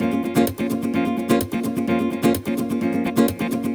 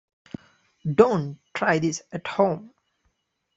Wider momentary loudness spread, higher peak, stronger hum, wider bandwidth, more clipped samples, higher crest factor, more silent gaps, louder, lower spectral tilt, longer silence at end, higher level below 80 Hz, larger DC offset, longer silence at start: second, 4 LU vs 23 LU; about the same, -4 dBFS vs -2 dBFS; neither; first, over 20 kHz vs 8 kHz; neither; second, 16 dB vs 22 dB; neither; about the same, -22 LUFS vs -24 LUFS; about the same, -6 dB/octave vs -6 dB/octave; second, 0 s vs 0.9 s; first, -50 dBFS vs -62 dBFS; neither; second, 0 s vs 0.85 s